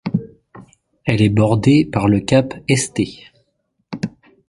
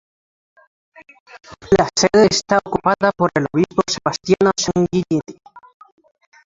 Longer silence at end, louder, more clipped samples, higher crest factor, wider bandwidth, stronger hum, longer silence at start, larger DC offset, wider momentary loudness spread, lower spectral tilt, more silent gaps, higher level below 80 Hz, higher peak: second, 0.4 s vs 0.85 s; about the same, -17 LUFS vs -17 LUFS; neither; about the same, 18 dB vs 18 dB; first, 11.5 kHz vs 7.8 kHz; neither; second, 0.05 s vs 1.35 s; neither; first, 14 LU vs 7 LU; first, -6 dB/octave vs -4.5 dB/octave; neither; about the same, -44 dBFS vs -48 dBFS; about the same, 0 dBFS vs 0 dBFS